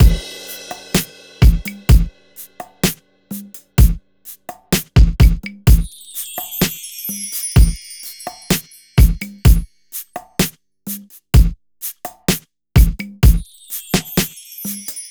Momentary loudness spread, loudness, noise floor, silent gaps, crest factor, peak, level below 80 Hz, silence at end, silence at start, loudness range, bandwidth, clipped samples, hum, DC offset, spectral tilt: 16 LU; -18 LUFS; -41 dBFS; none; 16 dB; 0 dBFS; -18 dBFS; 0.05 s; 0 s; 2 LU; over 20 kHz; under 0.1%; none; under 0.1%; -5 dB/octave